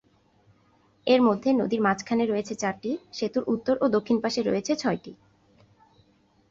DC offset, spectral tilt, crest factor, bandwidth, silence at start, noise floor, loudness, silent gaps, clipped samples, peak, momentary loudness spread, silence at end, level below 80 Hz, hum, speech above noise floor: under 0.1%; -5 dB/octave; 18 dB; 7.8 kHz; 1.05 s; -63 dBFS; -26 LUFS; none; under 0.1%; -8 dBFS; 9 LU; 1.35 s; -64 dBFS; none; 38 dB